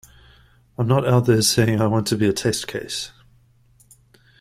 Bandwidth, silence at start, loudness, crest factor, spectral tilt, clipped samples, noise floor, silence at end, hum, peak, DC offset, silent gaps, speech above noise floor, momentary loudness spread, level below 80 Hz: 15.5 kHz; 0.8 s; -20 LUFS; 18 dB; -5 dB/octave; under 0.1%; -56 dBFS; 1.3 s; none; -4 dBFS; under 0.1%; none; 37 dB; 12 LU; -52 dBFS